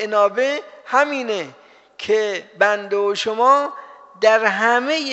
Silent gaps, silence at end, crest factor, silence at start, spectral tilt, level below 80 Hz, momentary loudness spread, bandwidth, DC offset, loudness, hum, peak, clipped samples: none; 0 s; 18 dB; 0 s; 0 dB/octave; -74 dBFS; 12 LU; 8 kHz; under 0.1%; -18 LUFS; none; -2 dBFS; under 0.1%